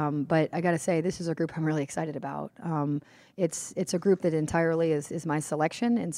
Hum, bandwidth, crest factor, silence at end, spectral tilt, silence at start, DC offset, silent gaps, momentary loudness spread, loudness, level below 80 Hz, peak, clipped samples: none; 15.5 kHz; 18 dB; 0 s; -6 dB/octave; 0 s; under 0.1%; none; 8 LU; -29 LUFS; -62 dBFS; -10 dBFS; under 0.1%